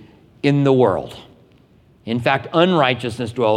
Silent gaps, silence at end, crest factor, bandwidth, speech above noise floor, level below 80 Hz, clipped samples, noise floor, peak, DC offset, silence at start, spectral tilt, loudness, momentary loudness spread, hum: none; 0 s; 18 dB; 11.5 kHz; 35 dB; -56 dBFS; under 0.1%; -52 dBFS; -2 dBFS; under 0.1%; 0.45 s; -7 dB/octave; -18 LUFS; 11 LU; none